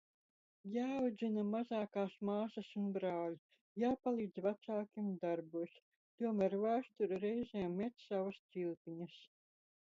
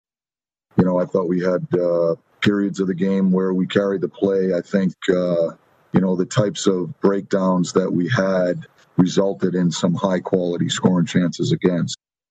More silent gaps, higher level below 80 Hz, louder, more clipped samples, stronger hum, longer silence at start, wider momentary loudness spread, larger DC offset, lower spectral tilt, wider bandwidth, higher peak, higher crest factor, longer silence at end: first, 3.39-3.49 s, 3.61-3.76 s, 5.82-6.18 s, 8.39-8.49 s, 8.77-8.85 s vs none; second, -80 dBFS vs -58 dBFS; second, -41 LUFS vs -20 LUFS; neither; neither; about the same, 0.65 s vs 0.75 s; first, 9 LU vs 4 LU; neither; about the same, -6.5 dB/octave vs -6.5 dB/octave; second, 7.4 kHz vs 8.6 kHz; second, -24 dBFS vs -2 dBFS; about the same, 16 dB vs 18 dB; first, 0.65 s vs 0.35 s